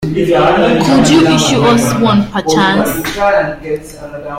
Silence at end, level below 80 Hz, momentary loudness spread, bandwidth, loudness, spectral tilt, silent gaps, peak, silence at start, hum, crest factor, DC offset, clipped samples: 0 s; -36 dBFS; 13 LU; 16.5 kHz; -10 LUFS; -5 dB/octave; none; 0 dBFS; 0 s; none; 10 dB; under 0.1%; under 0.1%